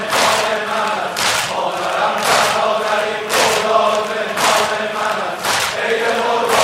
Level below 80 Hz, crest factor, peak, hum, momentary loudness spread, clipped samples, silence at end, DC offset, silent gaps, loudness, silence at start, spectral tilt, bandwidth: -56 dBFS; 16 dB; -2 dBFS; none; 5 LU; under 0.1%; 0 s; under 0.1%; none; -16 LUFS; 0 s; -1.5 dB/octave; 16 kHz